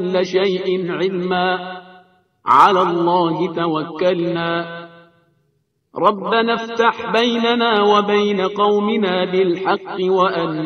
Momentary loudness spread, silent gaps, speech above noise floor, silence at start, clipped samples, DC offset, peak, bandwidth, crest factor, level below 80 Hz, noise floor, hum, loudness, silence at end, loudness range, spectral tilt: 7 LU; none; 49 dB; 0 s; under 0.1%; under 0.1%; 0 dBFS; 7.8 kHz; 18 dB; -62 dBFS; -66 dBFS; none; -17 LUFS; 0 s; 4 LU; -6 dB/octave